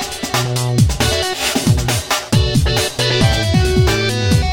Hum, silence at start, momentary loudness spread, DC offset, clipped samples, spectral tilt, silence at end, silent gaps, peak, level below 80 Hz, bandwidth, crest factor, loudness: none; 0 s; 3 LU; under 0.1%; under 0.1%; -4.5 dB/octave; 0 s; none; 0 dBFS; -24 dBFS; 17 kHz; 14 dB; -15 LUFS